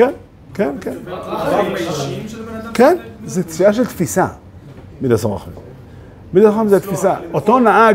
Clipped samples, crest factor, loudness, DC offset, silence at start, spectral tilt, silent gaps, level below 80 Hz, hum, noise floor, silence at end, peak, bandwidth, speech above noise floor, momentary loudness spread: under 0.1%; 16 dB; -16 LUFS; under 0.1%; 0 s; -6 dB/octave; none; -46 dBFS; none; -37 dBFS; 0 s; 0 dBFS; 16 kHz; 22 dB; 16 LU